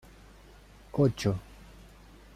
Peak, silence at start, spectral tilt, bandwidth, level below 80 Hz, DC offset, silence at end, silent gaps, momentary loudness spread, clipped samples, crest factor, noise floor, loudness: -12 dBFS; 0.95 s; -7 dB/octave; 14.5 kHz; -52 dBFS; under 0.1%; 0.95 s; none; 26 LU; under 0.1%; 20 dB; -53 dBFS; -30 LUFS